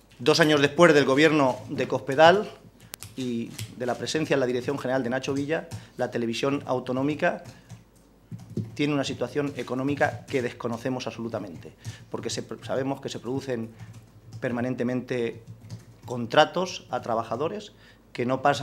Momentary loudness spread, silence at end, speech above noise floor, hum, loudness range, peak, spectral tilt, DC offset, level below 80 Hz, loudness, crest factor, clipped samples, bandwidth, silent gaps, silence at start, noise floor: 22 LU; 0 s; 30 dB; none; 10 LU; 0 dBFS; -5 dB/octave; under 0.1%; -62 dBFS; -26 LUFS; 26 dB; under 0.1%; 16 kHz; none; 0.2 s; -56 dBFS